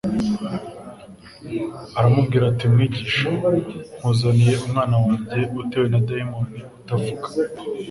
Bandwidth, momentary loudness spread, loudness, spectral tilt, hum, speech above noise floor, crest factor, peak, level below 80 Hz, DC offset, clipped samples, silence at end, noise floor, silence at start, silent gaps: 11.5 kHz; 13 LU; -21 LUFS; -7.5 dB/octave; none; 22 dB; 16 dB; -4 dBFS; -48 dBFS; under 0.1%; under 0.1%; 0 s; -42 dBFS; 0.05 s; none